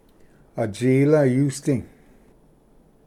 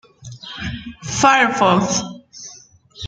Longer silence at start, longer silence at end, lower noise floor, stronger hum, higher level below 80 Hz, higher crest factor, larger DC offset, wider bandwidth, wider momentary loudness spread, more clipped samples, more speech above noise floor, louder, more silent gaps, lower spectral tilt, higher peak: first, 0.55 s vs 0.25 s; first, 1.2 s vs 0 s; first, -55 dBFS vs -45 dBFS; neither; second, -56 dBFS vs -46 dBFS; about the same, 16 dB vs 20 dB; neither; first, 14 kHz vs 9.6 kHz; second, 12 LU vs 23 LU; neither; first, 35 dB vs 29 dB; second, -21 LUFS vs -16 LUFS; neither; first, -7.5 dB/octave vs -3.5 dB/octave; second, -6 dBFS vs 0 dBFS